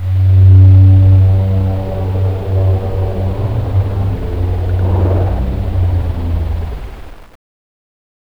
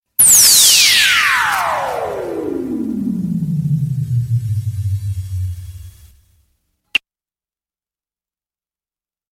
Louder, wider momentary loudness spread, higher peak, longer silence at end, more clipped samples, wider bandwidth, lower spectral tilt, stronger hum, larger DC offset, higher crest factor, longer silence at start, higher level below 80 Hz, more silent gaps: about the same, -13 LUFS vs -13 LUFS; second, 12 LU vs 17 LU; about the same, 0 dBFS vs 0 dBFS; second, 1.15 s vs 2.35 s; neither; second, 4 kHz vs 16.5 kHz; first, -10 dB/octave vs -2 dB/octave; neither; first, 1% vs under 0.1%; about the same, 12 dB vs 16 dB; second, 0 s vs 0.2 s; first, -22 dBFS vs -44 dBFS; neither